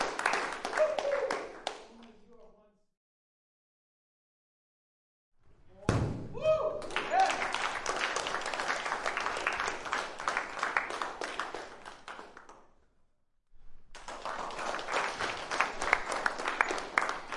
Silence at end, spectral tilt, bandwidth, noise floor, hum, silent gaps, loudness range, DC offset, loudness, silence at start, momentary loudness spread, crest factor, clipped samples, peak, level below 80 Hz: 0 s; -3.5 dB/octave; 11.5 kHz; -69 dBFS; none; 2.97-5.32 s; 12 LU; under 0.1%; -33 LUFS; 0 s; 13 LU; 30 dB; under 0.1%; -6 dBFS; -56 dBFS